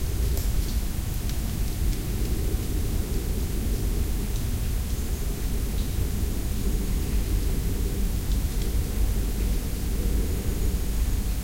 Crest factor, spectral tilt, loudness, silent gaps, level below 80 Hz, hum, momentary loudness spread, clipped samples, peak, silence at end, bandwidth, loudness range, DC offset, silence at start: 12 dB; -5.5 dB/octave; -29 LUFS; none; -26 dBFS; none; 2 LU; under 0.1%; -12 dBFS; 0 s; 16 kHz; 1 LU; under 0.1%; 0 s